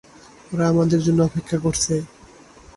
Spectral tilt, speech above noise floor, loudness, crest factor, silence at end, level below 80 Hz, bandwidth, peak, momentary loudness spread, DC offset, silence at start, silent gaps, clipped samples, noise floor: -5.5 dB/octave; 27 dB; -20 LUFS; 16 dB; 0.7 s; -46 dBFS; 11.5 kHz; -6 dBFS; 9 LU; under 0.1%; 0.5 s; none; under 0.1%; -47 dBFS